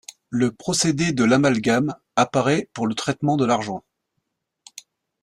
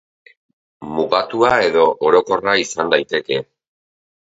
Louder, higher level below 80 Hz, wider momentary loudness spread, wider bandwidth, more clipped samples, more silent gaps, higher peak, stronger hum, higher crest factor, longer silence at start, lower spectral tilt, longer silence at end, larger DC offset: second, -21 LUFS vs -16 LUFS; about the same, -58 dBFS vs -54 dBFS; second, 7 LU vs 10 LU; first, 13.5 kHz vs 8 kHz; neither; neither; second, -4 dBFS vs 0 dBFS; neither; about the same, 18 dB vs 18 dB; second, 0.3 s vs 0.8 s; first, -5 dB/octave vs -3.5 dB/octave; second, 0.4 s vs 0.8 s; neither